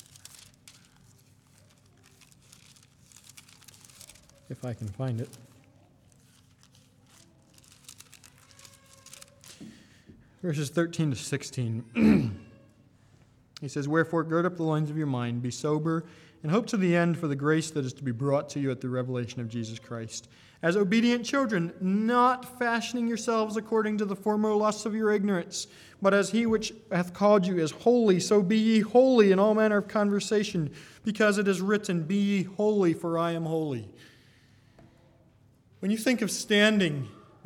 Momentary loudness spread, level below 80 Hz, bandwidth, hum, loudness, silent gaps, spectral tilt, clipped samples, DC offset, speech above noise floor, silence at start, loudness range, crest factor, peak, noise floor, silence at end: 15 LU; -64 dBFS; 15 kHz; none; -27 LUFS; none; -5.5 dB/octave; under 0.1%; under 0.1%; 34 dB; 3.35 s; 17 LU; 20 dB; -8 dBFS; -61 dBFS; 0.3 s